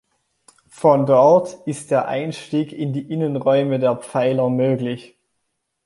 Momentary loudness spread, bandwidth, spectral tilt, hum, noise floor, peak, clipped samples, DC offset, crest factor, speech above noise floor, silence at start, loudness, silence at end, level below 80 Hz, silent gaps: 12 LU; 11.5 kHz; -7 dB/octave; none; -74 dBFS; -2 dBFS; under 0.1%; under 0.1%; 18 dB; 56 dB; 0.75 s; -19 LUFS; 0.85 s; -66 dBFS; none